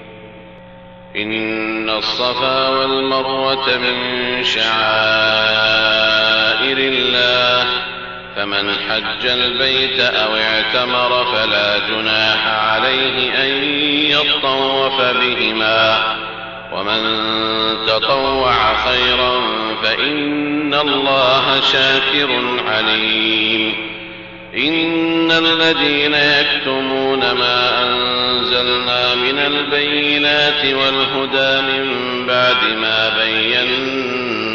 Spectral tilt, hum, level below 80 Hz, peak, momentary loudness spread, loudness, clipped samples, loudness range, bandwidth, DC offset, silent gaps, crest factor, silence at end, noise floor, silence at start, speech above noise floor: 0 dB/octave; none; -46 dBFS; -2 dBFS; 6 LU; -14 LUFS; under 0.1%; 2 LU; 7.4 kHz; 0.1%; none; 12 dB; 0 s; -38 dBFS; 0 s; 22 dB